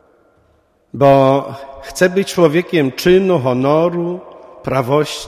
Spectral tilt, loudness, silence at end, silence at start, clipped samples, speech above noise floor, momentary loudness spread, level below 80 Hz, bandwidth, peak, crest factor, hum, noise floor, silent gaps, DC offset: -6 dB/octave; -14 LUFS; 0 s; 0.95 s; under 0.1%; 42 dB; 17 LU; -48 dBFS; 15.5 kHz; 0 dBFS; 16 dB; none; -56 dBFS; none; under 0.1%